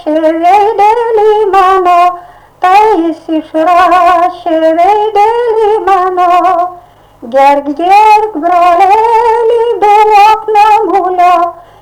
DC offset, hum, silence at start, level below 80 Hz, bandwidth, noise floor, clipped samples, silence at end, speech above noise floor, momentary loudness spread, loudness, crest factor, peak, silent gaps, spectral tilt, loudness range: under 0.1%; none; 0.05 s; -44 dBFS; 17 kHz; -35 dBFS; 0.5%; 0.3 s; 28 dB; 6 LU; -7 LUFS; 6 dB; 0 dBFS; none; -4 dB/octave; 2 LU